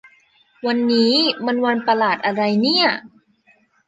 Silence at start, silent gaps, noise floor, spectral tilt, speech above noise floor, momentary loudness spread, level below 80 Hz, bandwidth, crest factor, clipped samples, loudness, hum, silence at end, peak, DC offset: 0.65 s; none; -58 dBFS; -5 dB/octave; 40 dB; 6 LU; -68 dBFS; 9 kHz; 16 dB; under 0.1%; -18 LUFS; none; 0.8 s; -4 dBFS; under 0.1%